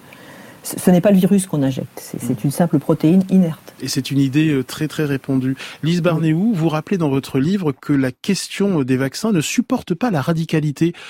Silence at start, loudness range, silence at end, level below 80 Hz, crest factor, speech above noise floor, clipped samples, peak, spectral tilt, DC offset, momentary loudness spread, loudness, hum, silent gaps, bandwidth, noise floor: 0.25 s; 2 LU; 0 s; -54 dBFS; 16 dB; 23 dB; under 0.1%; -2 dBFS; -6.5 dB/octave; under 0.1%; 9 LU; -18 LUFS; none; none; 16.5 kHz; -40 dBFS